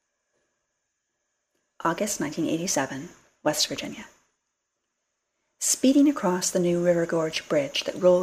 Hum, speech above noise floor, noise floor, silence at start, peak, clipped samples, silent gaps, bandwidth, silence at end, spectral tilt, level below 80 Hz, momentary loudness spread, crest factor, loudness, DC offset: none; 56 dB; -80 dBFS; 1.8 s; -8 dBFS; under 0.1%; none; 15.5 kHz; 0 s; -3.5 dB/octave; -66 dBFS; 12 LU; 20 dB; -25 LUFS; under 0.1%